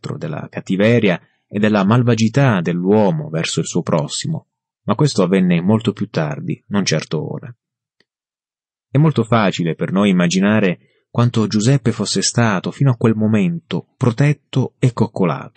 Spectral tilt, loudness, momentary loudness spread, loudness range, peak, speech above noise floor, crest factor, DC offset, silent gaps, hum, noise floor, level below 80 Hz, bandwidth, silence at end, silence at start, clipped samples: -6 dB/octave; -17 LUFS; 11 LU; 4 LU; -2 dBFS; over 74 dB; 14 dB; under 0.1%; none; none; under -90 dBFS; -56 dBFS; 8.8 kHz; 0.1 s; 0.05 s; under 0.1%